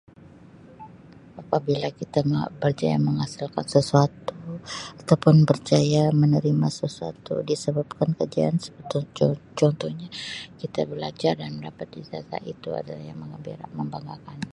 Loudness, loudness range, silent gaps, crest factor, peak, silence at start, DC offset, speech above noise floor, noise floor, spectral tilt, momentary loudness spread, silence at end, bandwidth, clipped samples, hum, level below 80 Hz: -24 LUFS; 10 LU; none; 22 dB; -2 dBFS; 0.8 s; under 0.1%; 24 dB; -48 dBFS; -7 dB/octave; 17 LU; 0.05 s; 11 kHz; under 0.1%; none; -58 dBFS